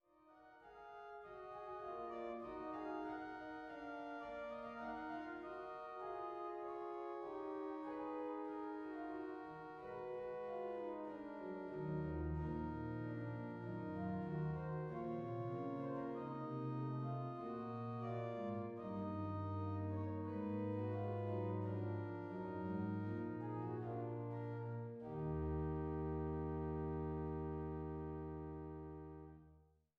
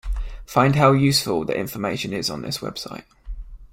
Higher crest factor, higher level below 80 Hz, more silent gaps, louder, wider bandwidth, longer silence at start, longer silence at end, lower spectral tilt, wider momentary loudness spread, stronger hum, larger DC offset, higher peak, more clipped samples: second, 14 dB vs 20 dB; second, -60 dBFS vs -36 dBFS; neither; second, -46 LUFS vs -21 LUFS; second, 6.6 kHz vs 16.5 kHz; first, 0.25 s vs 0.05 s; first, 0.35 s vs 0.05 s; first, -10 dB/octave vs -5 dB/octave; second, 7 LU vs 24 LU; neither; neither; second, -32 dBFS vs -2 dBFS; neither